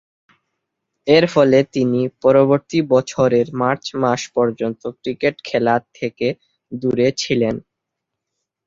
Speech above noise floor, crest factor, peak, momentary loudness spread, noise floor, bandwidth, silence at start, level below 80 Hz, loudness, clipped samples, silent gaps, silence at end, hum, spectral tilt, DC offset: 63 dB; 18 dB; 0 dBFS; 11 LU; -80 dBFS; 7.8 kHz; 1.05 s; -56 dBFS; -18 LUFS; under 0.1%; none; 1.05 s; none; -6 dB/octave; under 0.1%